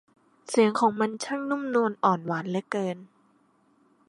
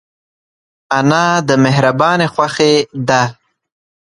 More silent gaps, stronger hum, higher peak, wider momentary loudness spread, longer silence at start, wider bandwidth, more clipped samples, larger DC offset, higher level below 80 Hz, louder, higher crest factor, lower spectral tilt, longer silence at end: neither; neither; second, -8 dBFS vs 0 dBFS; first, 8 LU vs 3 LU; second, 0.5 s vs 0.9 s; about the same, 11.5 kHz vs 11.5 kHz; neither; neither; second, -78 dBFS vs -56 dBFS; second, -26 LUFS vs -13 LUFS; first, 20 dB vs 14 dB; about the same, -5.5 dB/octave vs -5 dB/octave; first, 1.05 s vs 0.85 s